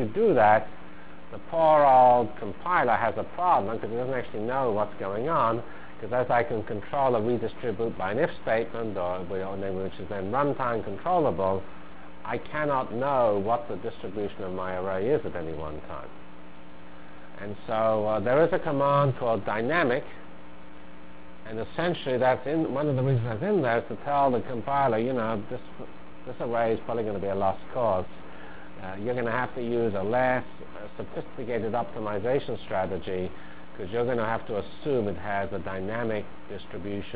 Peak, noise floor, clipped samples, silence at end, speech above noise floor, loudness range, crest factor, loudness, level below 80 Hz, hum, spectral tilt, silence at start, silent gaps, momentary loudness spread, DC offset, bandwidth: -8 dBFS; -48 dBFS; under 0.1%; 0 s; 21 dB; 7 LU; 20 dB; -27 LUFS; -54 dBFS; none; -10.5 dB/octave; 0 s; none; 18 LU; 2%; 4 kHz